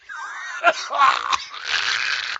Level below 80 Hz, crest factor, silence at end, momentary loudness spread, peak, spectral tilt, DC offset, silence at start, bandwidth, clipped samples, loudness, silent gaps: -66 dBFS; 20 dB; 0 s; 13 LU; -2 dBFS; 0.5 dB/octave; under 0.1%; 0.1 s; 9 kHz; under 0.1%; -20 LUFS; none